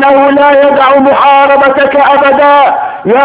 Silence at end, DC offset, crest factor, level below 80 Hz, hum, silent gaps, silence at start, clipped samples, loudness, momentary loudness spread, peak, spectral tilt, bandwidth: 0 s; under 0.1%; 4 dB; -46 dBFS; none; none; 0 s; 5%; -5 LUFS; 3 LU; 0 dBFS; -8 dB/octave; 4 kHz